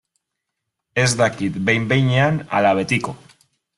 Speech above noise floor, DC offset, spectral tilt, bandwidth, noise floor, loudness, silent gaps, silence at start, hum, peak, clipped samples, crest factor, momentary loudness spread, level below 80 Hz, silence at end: 61 dB; under 0.1%; -5 dB/octave; 12 kHz; -79 dBFS; -18 LUFS; none; 0.95 s; none; -4 dBFS; under 0.1%; 18 dB; 5 LU; -54 dBFS; 0.6 s